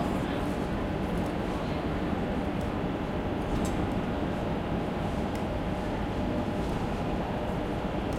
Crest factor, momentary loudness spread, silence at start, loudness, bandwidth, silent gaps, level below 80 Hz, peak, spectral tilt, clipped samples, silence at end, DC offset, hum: 14 dB; 2 LU; 0 s; -31 LUFS; 16 kHz; none; -40 dBFS; -16 dBFS; -7 dB/octave; under 0.1%; 0 s; under 0.1%; none